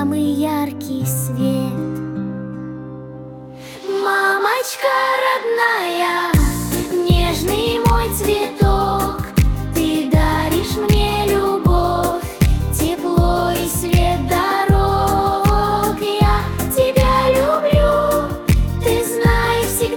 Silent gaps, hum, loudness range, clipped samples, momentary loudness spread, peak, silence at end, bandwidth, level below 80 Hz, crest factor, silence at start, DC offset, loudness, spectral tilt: none; none; 5 LU; under 0.1%; 9 LU; -2 dBFS; 0 s; 18 kHz; -24 dBFS; 14 dB; 0 s; under 0.1%; -17 LUFS; -5.5 dB/octave